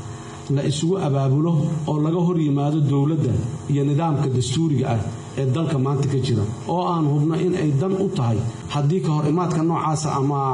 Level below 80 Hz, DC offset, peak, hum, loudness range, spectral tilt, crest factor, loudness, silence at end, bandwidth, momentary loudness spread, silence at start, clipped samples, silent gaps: -52 dBFS; under 0.1%; -12 dBFS; none; 1 LU; -7.5 dB/octave; 8 dB; -21 LUFS; 0 s; 10 kHz; 4 LU; 0 s; under 0.1%; none